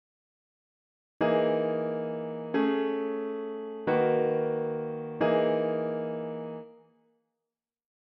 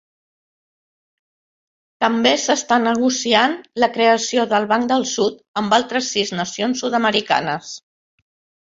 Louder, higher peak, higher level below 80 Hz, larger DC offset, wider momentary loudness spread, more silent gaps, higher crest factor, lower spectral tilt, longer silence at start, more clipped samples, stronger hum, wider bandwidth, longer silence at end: second, -29 LUFS vs -18 LUFS; second, -14 dBFS vs -2 dBFS; second, -76 dBFS vs -64 dBFS; neither; first, 10 LU vs 7 LU; second, none vs 5.48-5.54 s; about the same, 16 dB vs 18 dB; first, -5.5 dB/octave vs -3 dB/octave; second, 1.2 s vs 2 s; neither; neither; second, 5.4 kHz vs 7.8 kHz; first, 1.3 s vs 0.95 s